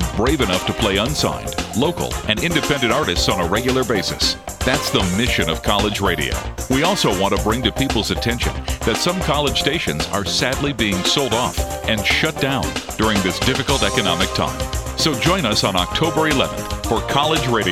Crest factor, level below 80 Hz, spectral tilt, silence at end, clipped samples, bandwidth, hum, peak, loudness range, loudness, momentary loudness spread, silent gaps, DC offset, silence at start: 18 dB; -32 dBFS; -4 dB/octave; 0 s; under 0.1%; 17 kHz; none; 0 dBFS; 1 LU; -18 LUFS; 5 LU; none; 0.2%; 0 s